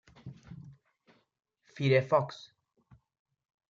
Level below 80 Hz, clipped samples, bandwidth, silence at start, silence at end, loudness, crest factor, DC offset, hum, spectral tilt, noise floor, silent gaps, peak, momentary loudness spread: -72 dBFS; under 0.1%; 7.4 kHz; 0.25 s; 1.35 s; -29 LUFS; 22 dB; under 0.1%; none; -7 dB/octave; -68 dBFS; none; -12 dBFS; 25 LU